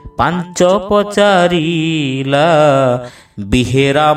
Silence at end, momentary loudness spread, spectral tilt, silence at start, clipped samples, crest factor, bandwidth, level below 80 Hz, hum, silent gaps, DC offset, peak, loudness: 0 s; 7 LU; -5.5 dB/octave; 0.05 s; under 0.1%; 12 dB; 14 kHz; -36 dBFS; none; none; under 0.1%; 0 dBFS; -12 LUFS